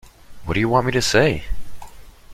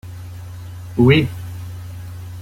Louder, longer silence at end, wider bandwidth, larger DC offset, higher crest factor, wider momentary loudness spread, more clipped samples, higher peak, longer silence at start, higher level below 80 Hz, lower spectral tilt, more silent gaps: second, -19 LUFS vs -16 LUFS; about the same, 0 s vs 0 s; about the same, 16 kHz vs 16 kHz; neither; about the same, 18 dB vs 18 dB; about the same, 19 LU vs 20 LU; neither; about the same, -2 dBFS vs -2 dBFS; about the same, 0.05 s vs 0.05 s; first, -36 dBFS vs -44 dBFS; second, -4.5 dB/octave vs -7.5 dB/octave; neither